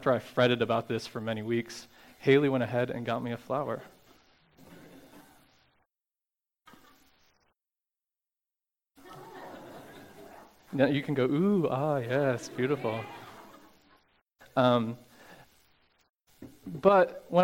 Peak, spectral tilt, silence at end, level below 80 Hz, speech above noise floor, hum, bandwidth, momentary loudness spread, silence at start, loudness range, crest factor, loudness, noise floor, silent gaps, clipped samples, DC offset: -8 dBFS; -6.5 dB/octave; 0 s; -70 dBFS; over 62 dB; none; 17 kHz; 23 LU; 0 s; 18 LU; 24 dB; -29 LUFS; under -90 dBFS; none; under 0.1%; under 0.1%